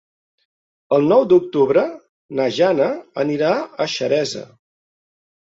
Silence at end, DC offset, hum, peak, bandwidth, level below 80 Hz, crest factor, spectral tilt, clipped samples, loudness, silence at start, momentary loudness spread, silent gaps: 1.15 s; under 0.1%; none; -2 dBFS; 7.8 kHz; -64 dBFS; 16 dB; -5.5 dB/octave; under 0.1%; -18 LUFS; 0.9 s; 10 LU; 2.09-2.29 s